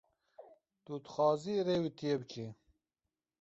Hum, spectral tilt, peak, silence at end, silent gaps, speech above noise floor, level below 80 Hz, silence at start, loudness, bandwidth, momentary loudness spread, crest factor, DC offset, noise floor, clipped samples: none; -5.5 dB/octave; -18 dBFS; 0.9 s; none; over 55 dB; -74 dBFS; 0.4 s; -36 LUFS; 7.6 kHz; 15 LU; 18 dB; under 0.1%; under -90 dBFS; under 0.1%